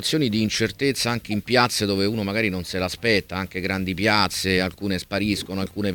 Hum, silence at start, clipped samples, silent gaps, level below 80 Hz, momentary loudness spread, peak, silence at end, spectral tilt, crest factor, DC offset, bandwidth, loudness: none; 0 s; under 0.1%; none; -48 dBFS; 7 LU; -2 dBFS; 0 s; -4.5 dB/octave; 22 dB; under 0.1%; 19 kHz; -23 LUFS